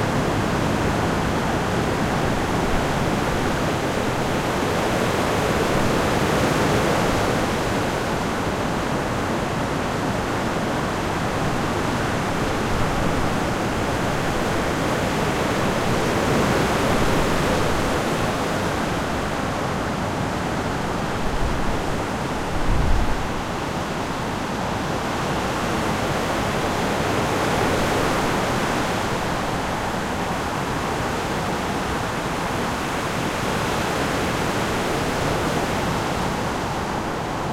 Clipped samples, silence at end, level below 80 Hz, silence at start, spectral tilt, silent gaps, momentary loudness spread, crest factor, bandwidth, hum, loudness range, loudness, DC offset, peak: under 0.1%; 0 s; -34 dBFS; 0 s; -5 dB/octave; none; 4 LU; 16 dB; 16.5 kHz; none; 4 LU; -23 LUFS; under 0.1%; -6 dBFS